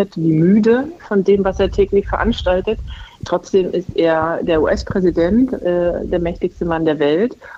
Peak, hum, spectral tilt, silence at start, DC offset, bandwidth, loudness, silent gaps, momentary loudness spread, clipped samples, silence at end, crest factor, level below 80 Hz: -4 dBFS; none; -7.5 dB/octave; 0 s; under 0.1%; 7.6 kHz; -17 LUFS; none; 8 LU; under 0.1%; 0 s; 12 dB; -32 dBFS